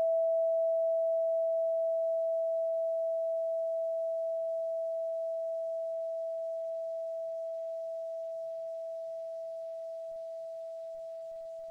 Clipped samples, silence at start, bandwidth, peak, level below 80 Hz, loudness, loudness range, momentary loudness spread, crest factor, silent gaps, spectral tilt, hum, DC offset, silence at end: under 0.1%; 0 s; 0.8 kHz; -26 dBFS; -86 dBFS; -34 LUFS; 9 LU; 12 LU; 8 dB; none; -3.5 dB/octave; none; under 0.1%; 0 s